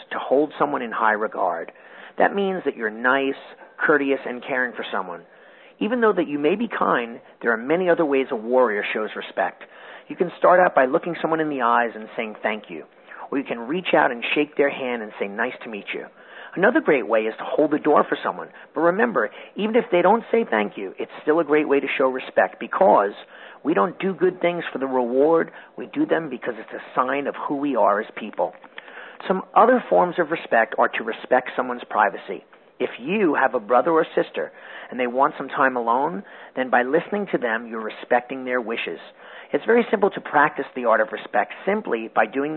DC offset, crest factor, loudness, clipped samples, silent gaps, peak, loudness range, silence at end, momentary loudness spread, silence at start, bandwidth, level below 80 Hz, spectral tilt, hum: under 0.1%; 20 dB; -22 LUFS; under 0.1%; none; -2 dBFS; 3 LU; 0 s; 14 LU; 0 s; 4.3 kHz; -74 dBFS; -10 dB/octave; none